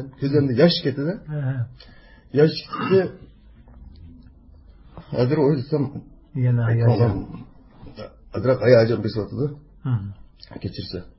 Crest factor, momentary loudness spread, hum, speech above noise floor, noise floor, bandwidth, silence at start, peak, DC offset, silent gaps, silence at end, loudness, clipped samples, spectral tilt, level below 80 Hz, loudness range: 20 dB; 17 LU; none; 27 dB; -48 dBFS; 5.8 kHz; 0 s; -2 dBFS; under 0.1%; none; 0.1 s; -21 LUFS; under 0.1%; -11.5 dB/octave; -46 dBFS; 4 LU